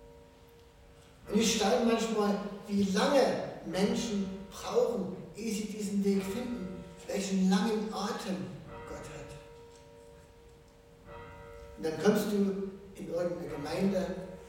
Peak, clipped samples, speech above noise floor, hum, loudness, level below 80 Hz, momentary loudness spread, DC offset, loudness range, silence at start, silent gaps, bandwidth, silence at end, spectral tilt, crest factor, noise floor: -12 dBFS; under 0.1%; 27 dB; none; -32 LUFS; -58 dBFS; 18 LU; under 0.1%; 12 LU; 0 s; none; 17 kHz; 0 s; -5 dB/octave; 22 dB; -57 dBFS